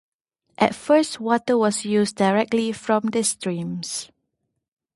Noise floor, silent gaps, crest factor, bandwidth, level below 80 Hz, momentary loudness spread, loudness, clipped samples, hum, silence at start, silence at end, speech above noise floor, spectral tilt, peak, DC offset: -77 dBFS; none; 20 dB; 12 kHz; -64 dBFS; 9 LU; -22 LUFS; under 0.1%; none; 0.6 s; 0.9 s; 56 dB; -4.5 dB/octave; -2 dBFS; under 0.1%